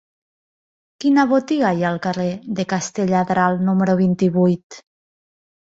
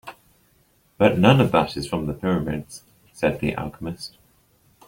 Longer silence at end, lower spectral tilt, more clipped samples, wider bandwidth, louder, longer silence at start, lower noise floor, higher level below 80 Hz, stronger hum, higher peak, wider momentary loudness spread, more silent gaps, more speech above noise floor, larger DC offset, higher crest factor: first, 1 s vs 0.8 s; about the same, -6.5 dB/octave vs -6.5 dB/octave; neither; second, 7.8 kHz vs 16.5 kHz; first, -19 LUFS vs -22 LUFS; first, 1 s vs 0.05 s; first, under -90 dBFS vs -61 dBFS; second, -60 dBFS vs -48 dBFS; neither; about the same, -4 dBFS vs -2 dBFS; second, 7 LU vs 21 LU; first, 4.63-4.70 s vs none; first, over 72 dB vs 40 dB; neither; second, 16 dB vs 22 dB